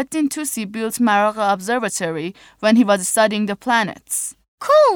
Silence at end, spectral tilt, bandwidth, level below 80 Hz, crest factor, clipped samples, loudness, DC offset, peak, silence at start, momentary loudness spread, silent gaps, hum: 0 s; -3.5 dB/octave; over 20 kHz; -62 dBFS; 14 dB; under 0.1%; -18 LUFS; under 0.1%; -4 dBFS; 0 s; 9 LU; 4.48-4.58 s; none